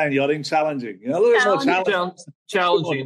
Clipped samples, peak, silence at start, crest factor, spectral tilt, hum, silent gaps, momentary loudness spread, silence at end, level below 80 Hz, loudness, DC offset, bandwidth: under 0.1%; -6 dBFS; 0 s; 14 dB; -5 dB/octave; none; 2.35-2.46 s; 10 LU; 0 s; -72 dBFS; -20 LUFS; under 0.1%; 12.5 kHz